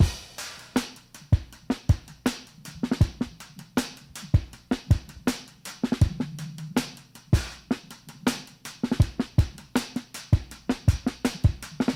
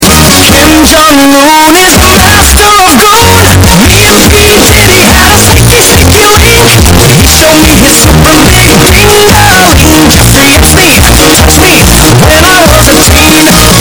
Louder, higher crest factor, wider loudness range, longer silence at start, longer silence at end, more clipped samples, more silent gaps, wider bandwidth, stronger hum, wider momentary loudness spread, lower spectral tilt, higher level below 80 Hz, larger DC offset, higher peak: second, -28 LUFS vs -1 LUFS; first, 20 dB vs 2 dB; about the same, 2 LU vs 0 LU; about the same, 0 s vs 0 s; about the same, 0 s vs 0 s; second, under 0.1% vs 40%; neither; second, 16.5 kHz vs over 20 kHz; neither; first, 12 LU vs 1 LU; first, -6 dB/octave vs -3.5 dB/octave; second, -34 dBFS vs -12 dBFS; neither; second, -8 dBFS vs 0 dBFS